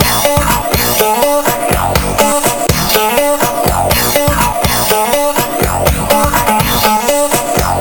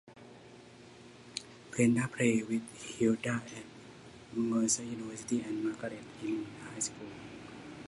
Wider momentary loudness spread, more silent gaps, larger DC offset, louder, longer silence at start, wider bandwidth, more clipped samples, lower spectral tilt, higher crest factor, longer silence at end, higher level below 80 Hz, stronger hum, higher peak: second, 3 LU vs 24 LU; neither; neither; first, -11 LUFS vs -34 LUFS; about the same, 0 s vs 0.05 s; first, over 20 kHz vs 11.5 kHz; neither; about the same, -3.5 dB/octave vs -4.5 dB/octave; second, 12 dB vs 20 dB; about the same, 0 s vs 0 s; first, -24 dBFS vs -70 dBFS; neither; first, 0 dBFS vs -16 dBFS